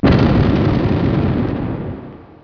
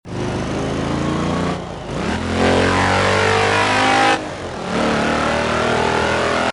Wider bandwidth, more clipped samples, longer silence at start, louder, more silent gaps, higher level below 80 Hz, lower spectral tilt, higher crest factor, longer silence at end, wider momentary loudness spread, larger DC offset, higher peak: second, 5.4 kHz vs 11.5 kHz; neither; about the same, 0 s vs 0.05 s; about the same, -16 LUFS vs -17 LUFS; neither; first, -28 dBFS vs -38 dBFS; first, -9.5 dB/octave vs -4.5 dB/octave; about the same, 14 dB vs 16 dB; first, 0.2 s vs 0 s; first, 16 LU vs 9 LU; neither; about the same, -2 dBFS vs -2 dBFS